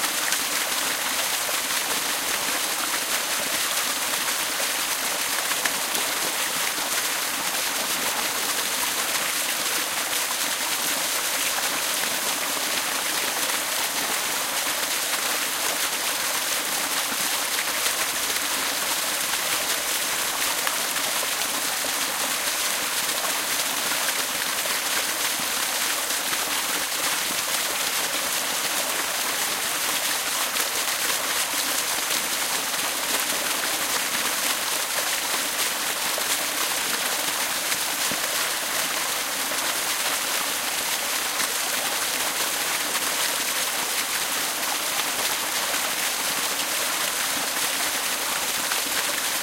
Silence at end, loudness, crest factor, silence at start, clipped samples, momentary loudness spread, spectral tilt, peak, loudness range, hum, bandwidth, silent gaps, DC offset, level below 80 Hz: 0 s; -23 LUFS; 20 dB; 0 s; under 0.1%; 1 LU; 1 dB/octave; -4 dBFS; 0 LU; none; 16 kHz; none; under 0.1%; -62 dBFS